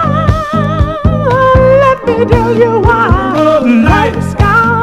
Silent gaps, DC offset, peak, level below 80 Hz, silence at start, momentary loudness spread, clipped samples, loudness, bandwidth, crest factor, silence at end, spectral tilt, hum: none; under 0.1%; 0 dBFS; -20 dBFS; 0 s; 5 LU; 0.8%; -9 LUFS; 13.5 kHz; 8 dB; 0 s; -8 dB/octave; none